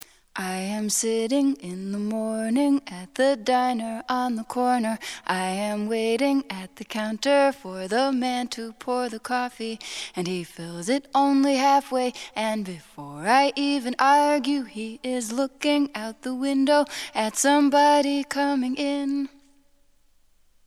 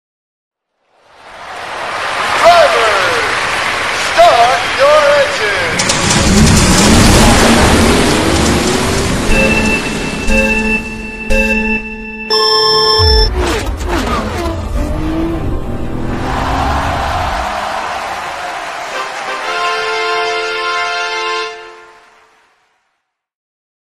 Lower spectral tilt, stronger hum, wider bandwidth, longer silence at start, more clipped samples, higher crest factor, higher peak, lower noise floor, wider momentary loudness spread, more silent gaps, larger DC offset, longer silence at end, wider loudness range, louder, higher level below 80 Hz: about the same, -3.5 dB/octave vs -4 dB/octave; neither; second, 14 kHz vs 16 kHz; second, 0.35 s vs 1.2 s; second, under 0.1% vs 0.1%; first, 18 dB vs 12 dB; second, -6 dBFS vs 0 dBFS; second, -59 dBFS vs -68 dBFS; about the same, 13 LU vs 13 LU; neither; neither; second, 1.4 s vs 1.9 s; second, 4 LU vs 9 LU; second, -24 LUFS vs -12 LUFS; second, -64 dBFS vs -22 dBFS